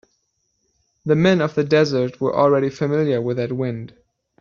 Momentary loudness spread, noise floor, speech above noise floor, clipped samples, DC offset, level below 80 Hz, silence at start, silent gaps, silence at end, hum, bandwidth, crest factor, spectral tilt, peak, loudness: 10 LU; -70 dBFS; 51 dB; under 0.1%; under 0.1%; -58 dBFS; 1.05 s; none; 0.55 s; none; 7.2 kHz; 16 dB; -6 dB/octave; -4 dBFS; -19 LUFS